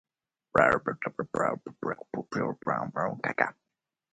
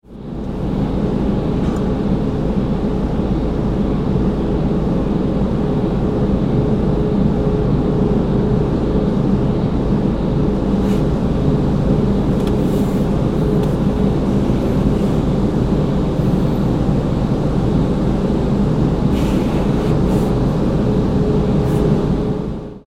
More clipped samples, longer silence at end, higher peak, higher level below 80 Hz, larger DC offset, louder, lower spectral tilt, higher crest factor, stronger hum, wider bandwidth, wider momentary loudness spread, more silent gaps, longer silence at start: neither; first, 0.6 s vs 0.1 s; about the same, -6 dBFS vs -4 dBFS; second, -60 dBFS vs -24 dBFS; neither; second, -30 LUFS vs -17 LUFS; second, -6.5 dB/octave vs -9 dB/octave; first, 26 dB vs 12 dB; neither; second, 9.4 kHz vs 13.5 kHz; first, 11 LU vs 3 LU; neither; first, 0.55 s vs 0.1 s